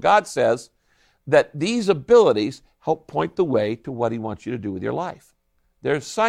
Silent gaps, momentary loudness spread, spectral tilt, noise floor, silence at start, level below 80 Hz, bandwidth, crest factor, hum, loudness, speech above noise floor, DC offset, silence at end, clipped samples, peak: none; 14 LU; -5.5 dB/octave; -62 dBFS; 0 s; -58 dBFS; 12 kHz; 18 dB; none; -22 LUFS; 42 dB; under 0.1%; 0 s; under 0.1%; -4 dBFS